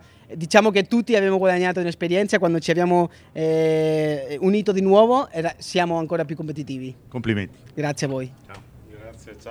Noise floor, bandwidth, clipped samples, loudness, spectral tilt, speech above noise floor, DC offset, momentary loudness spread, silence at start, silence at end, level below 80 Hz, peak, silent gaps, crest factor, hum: -42 dBFS; 15 kHz; under 0.1%; -21 LUFS; -6 dB/octave; 22 dB; under 0.1%; 14 LU; 0.3 s; 0 s; -58 dBFS; 0 dBFS; none; 20 dB; none